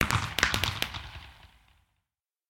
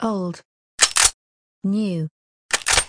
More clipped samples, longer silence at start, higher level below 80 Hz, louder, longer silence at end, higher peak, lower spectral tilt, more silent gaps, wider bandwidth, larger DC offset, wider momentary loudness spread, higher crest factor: neither; about the same, 0 s vs 0 s; about the same, -46 dBFS vs -44 dBFS; second, -28 LUFS vs -19 LUFS; first, 1.05 s vs 0 s; second, -4 dBFS vs 0 dBFS; about the same, -2.5 dB/octave vs -2 dB/octave; second, none vs 0.45-0.78 s, 1.14-1.62 s, 2.11-2.49 s; first, 17 kHz vs 10.5 kHz; neither; about the same, 19 LU vs 18 LU; first, 28 dB vs 22 dB